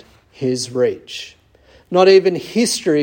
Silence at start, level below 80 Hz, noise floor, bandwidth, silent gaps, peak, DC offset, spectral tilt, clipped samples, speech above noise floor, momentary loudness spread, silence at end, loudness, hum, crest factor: 0.4 s; -58 dBFS; -50 dBFS; 16.5 kHz; none; -2 dBFS; under 0.1%; -4.5 dB/octave; under 0.1%; 35 dB; 19 LU; 0 s; -16 LUFS; none; 16 dB